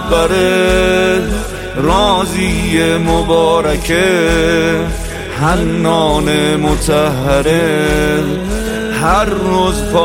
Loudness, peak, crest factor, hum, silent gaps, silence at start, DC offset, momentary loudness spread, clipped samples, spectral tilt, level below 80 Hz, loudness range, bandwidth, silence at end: -13 LUFS; 0 dBFS; 12 dB; none; none; 0 s; under 0.1%; 6 LU; under 0.1%; -5 dB/octave; -24 dBFS; 1 LU; 16.5 kHz; 0 s